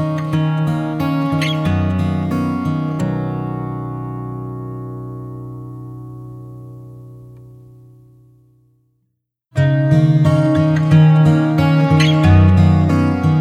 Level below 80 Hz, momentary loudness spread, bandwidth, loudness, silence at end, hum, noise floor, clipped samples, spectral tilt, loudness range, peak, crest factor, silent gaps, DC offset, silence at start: -40 dBFS; 21 LU; 9 kHz; -15 LUFS; 0 s; none; -71 dBFS; under 0.1%; -8 dB/octave; 21 LU; -2 dBFS; 14 dB; none; under 0.1%; 0 s